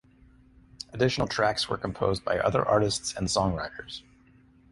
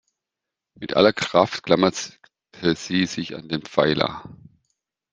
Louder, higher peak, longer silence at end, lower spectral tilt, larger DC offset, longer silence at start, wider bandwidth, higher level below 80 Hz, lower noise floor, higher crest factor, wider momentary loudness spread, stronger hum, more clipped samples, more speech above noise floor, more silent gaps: second, -27 LUFS vs -22 LUFS; second, -8 dBFS vs -2 dBFS; about the same, 0.7 s vs 0.8 s; about the same, -4.5 dB/octave vs -4.5 dB/octave; neither; about the same, 0.9 s vs 0.8 s; first, 11.5 kHz vs 10 kHz; first, -48 dBFS vs -58 dBFS; second, -58 dBFS vs -86 dBFS; about the same, 22 dB vs 22 dB; first, 16 LU vs 13 LU; neither; neither; second, 31 dB vs 64 dB; neither